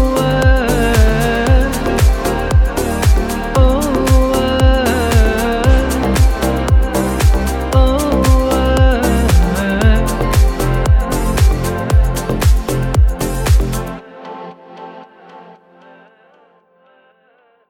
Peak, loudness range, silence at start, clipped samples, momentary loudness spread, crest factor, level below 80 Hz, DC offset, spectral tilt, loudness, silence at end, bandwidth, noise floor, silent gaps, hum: 0 dBFS; 5 LU; 0 s; under 0.1%; 5 LU; 12 dB; -16 dBFS; under 0.1%; -6 dB/octave; -14 LUFS; 2.3 s; 17 kHz; -54 dBFS; none; none